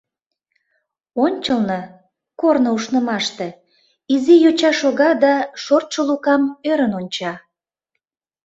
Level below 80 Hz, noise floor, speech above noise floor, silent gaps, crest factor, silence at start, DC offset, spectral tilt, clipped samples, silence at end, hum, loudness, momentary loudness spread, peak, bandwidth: -62 dBFS; -78 dBFS; 61 dB; none; 16 dB; 1.15 s; under 0.1%; -4.5 dB/octave; under 0.1%; 1.1 s; none; -17 LUFS; 14 LU; -2 dBFS; 8 kHz